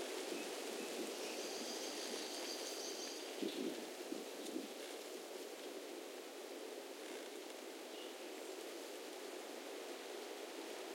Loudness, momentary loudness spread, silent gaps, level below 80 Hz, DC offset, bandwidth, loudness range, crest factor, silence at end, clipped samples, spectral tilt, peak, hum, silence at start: -47 LUFS; 6 LU; none; under -90 dBFS; under 0.1%; 16.5 kHz; 5 LU; 18 dB; 0 s; under 0.1%; -1 dB/octave; -30 dBFS; none; 0 s